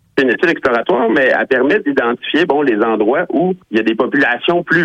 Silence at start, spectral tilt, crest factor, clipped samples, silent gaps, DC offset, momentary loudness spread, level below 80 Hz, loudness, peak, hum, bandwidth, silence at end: 0.15 s; -6.5 dB/octave; 10 dB; under 0.1%; none; under 0.1%; 4 LU; -56 dBFS; -14 LUFS; -2 dBFS; none; 8.2 kHz; 0 s